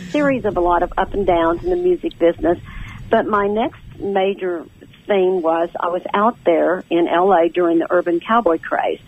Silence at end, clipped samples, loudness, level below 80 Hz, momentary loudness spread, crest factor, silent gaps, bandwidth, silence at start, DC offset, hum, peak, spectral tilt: 0.1 s; under 0.1%; -18 LUFS; -38 dBFS; 7 LU; 14 dB; none; 8.2 kHz; 0 s; under 0.1%; none; -2 dBFS; -7.5 dB/octave